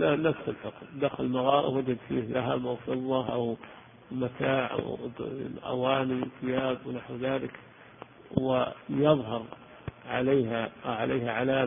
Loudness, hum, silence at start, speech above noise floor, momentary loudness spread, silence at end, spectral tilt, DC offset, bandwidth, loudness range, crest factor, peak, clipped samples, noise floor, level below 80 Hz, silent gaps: -30 LUFS; none; 0 s; 21 dB; 15 LU; 0 s; -10.5 dB/octave; under 0.1%; 3.7 kHz; 3 LU; 22 dB; -8 dBFS; under 0.1%; -50 dBFS; -60 dBFS; none